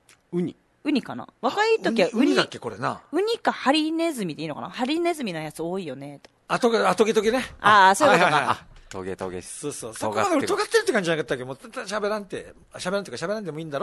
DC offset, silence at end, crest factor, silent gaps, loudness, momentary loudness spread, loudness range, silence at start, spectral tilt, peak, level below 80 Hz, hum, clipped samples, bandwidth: under 0.1%; 0 s; 22 dB; none; -23 LUFS; 15 LU; 6 LU; 0.3 s; -4 dB/octave; -2 dBFS; -60 dBFS; none; under 0.1%; 12.5 kHz